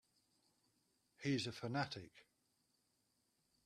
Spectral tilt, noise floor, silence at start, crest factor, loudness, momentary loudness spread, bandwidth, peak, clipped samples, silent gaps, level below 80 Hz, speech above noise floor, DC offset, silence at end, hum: -5 dB/octave; -83 dBFS; 1.2 s; 22 dB; -44 LUFS; 11 LU; 13.5 kHz; -26 dBFS; under 0.1%; none; -82 dBFS; 40 dB; under 0.1%; 1.45 s; none